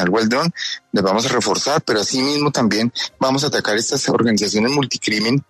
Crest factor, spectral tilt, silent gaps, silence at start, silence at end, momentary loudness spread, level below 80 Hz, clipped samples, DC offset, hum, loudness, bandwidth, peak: 14 dB; -4 dB/octave; none; 0 s; 0.1 s; 3 LU; -58 dBFS; under 0.1%; under 0.1%; none; -18 LUFS; 13.5 kHz; -4 dBFS